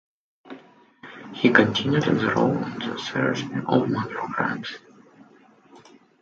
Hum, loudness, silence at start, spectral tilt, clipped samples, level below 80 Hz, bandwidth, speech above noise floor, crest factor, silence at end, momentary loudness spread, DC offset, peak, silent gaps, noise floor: none; -23 LUFS; 0.45 s; -6 dB/octave; under 0.1%; -62 dBFS; 7.6 kHz; 31 dB; 24 dB; 0.45 s; 24 LU; under 0.1%; 0 dBFS; none; -54 dBFS